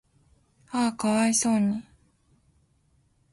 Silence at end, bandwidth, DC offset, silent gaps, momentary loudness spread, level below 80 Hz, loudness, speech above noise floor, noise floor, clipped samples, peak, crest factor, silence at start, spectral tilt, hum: 1.5 s; 11.5 kHz; under 0.1%; none; 10 LU; -64 dBFS; -25 LUFS; 42 dB; -66 dBFS; under 0.1%; -12 dBFS; 18 dB; 0.7 s; -4 dB/octave; none